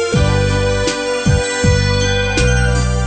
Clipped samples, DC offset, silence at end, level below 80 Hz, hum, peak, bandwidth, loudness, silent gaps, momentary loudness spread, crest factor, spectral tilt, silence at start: under 0.1%; under 0.1%; 0 s; -20 dBFS; none; -2 dBFS; 9 kHz; -15 LUFS; none; 3 LU; 12 dB; -5 dB/octave; 0 s